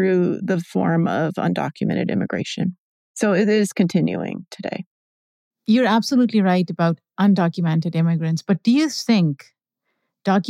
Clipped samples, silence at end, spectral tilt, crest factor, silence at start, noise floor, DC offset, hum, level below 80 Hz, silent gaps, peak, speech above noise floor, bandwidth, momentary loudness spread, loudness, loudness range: under 0.1%; 0 s; -6.5 dB/octave; 14 dB; 0 s; -76 dBFS; under 0.1%; none; -70 dBFS; 2.78-3.14 s, 4.86-5.51 s; -6 dBFS; 57 dB; 13.5 kHz; 11 LU; -20 LUFS; 3 LU